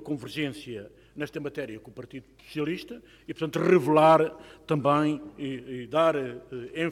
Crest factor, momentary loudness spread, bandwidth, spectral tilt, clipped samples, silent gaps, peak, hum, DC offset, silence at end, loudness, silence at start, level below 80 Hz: 20 dB; 22 LU; 15 kHz; -6.5 dB/octave; under 0.1%; none; -8 dBFS; none; under 0.1%; 0 s; -26 LUFS; 0 s; -62 dBFS